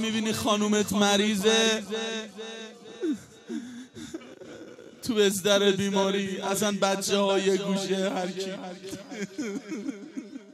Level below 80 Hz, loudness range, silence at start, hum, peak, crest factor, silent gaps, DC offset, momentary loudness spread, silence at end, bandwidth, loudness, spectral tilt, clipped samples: -68 dBFS; 7 LU; 0 s; none; -10 dBFS; 18 dB; none; under 0.1%; 19 LU; 0 s; 15.5 kHz; -26 LUFS; -3.5 dB/octave; under 0.1%